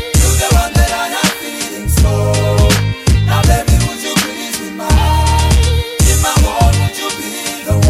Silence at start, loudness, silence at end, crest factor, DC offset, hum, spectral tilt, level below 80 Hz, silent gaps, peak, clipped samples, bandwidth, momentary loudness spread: 0 s; -13 LUFS; 0 s; 12 dB; under 0.1%; none; -4.5 dB/octave; -16 dBFS; none; 0 dBFS; under 0.1%; 16 kHz; 8 LU